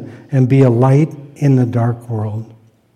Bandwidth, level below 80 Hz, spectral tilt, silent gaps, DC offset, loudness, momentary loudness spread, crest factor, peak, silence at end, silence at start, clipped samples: 8.8 kHz; -56 dBFS; -9.5 dB/octave; none; under 0.1%; -14 LUFS; 11 LU; 12 dB; -2 dBFS; 0.5 s; 0 s; under 0.1%